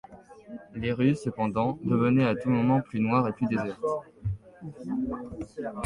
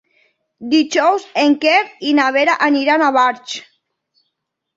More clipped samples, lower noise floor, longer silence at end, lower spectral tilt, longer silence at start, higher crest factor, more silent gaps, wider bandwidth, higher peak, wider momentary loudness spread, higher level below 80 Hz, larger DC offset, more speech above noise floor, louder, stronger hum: neither; second, -47 dBFS vs -75 dBFS; second, 0 s vs 1.15 s; first, -8.5 dB/octave vs -2.5 dB/octave; second, 0.1 s vs 0.6 s; about the same, 16 dB vs 16 dB; neither; first, 10.5 kHz vs 7.8 kHz; second, -12 dBFS vs -2 dBFS; first, 15 LU vs 12 LU; first, -52 dBFS vs -66 dBFS; neither; second, 20 dB vs 60 dB; second, -28 LUFS vs -14 LUFS; neither